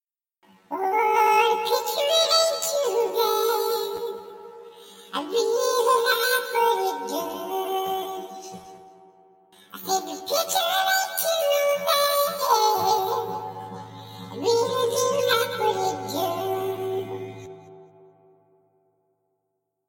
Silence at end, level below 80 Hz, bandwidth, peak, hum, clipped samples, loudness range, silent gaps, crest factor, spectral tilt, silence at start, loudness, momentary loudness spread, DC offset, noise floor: 2.05 s; -74 dBFS; 17 kHz; -10 dBFS; none; under 0.1%; 9 LU; none; 16 dB; -1.5 dB/octave; 0.7 s; -23 LUFS; 18 LU; under 0.1%; -78 dBFS